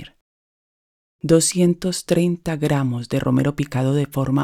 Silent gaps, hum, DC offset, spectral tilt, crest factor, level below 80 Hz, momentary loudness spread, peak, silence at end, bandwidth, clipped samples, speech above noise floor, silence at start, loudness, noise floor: 0.21-1.19 s; none; under 0.1%; -5.5 dB/octave; 20 dB; -48 dBFS; 6 LU; -2 dBFS; 0 s; 15.5 kHz; under 0.1%; over 71 dB; 0 s; -20 LUFS; under -90 dBFS